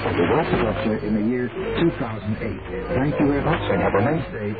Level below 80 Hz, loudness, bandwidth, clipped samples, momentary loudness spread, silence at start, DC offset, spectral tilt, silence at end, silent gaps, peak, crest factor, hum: -38 dBFS; -22 LUFS; 4.9 kHz; under 0.1%; 7 LU; 0 s; 0.3%; -10.5 dB/octave; 0 s; none; -8 dBFS; 14 dB; none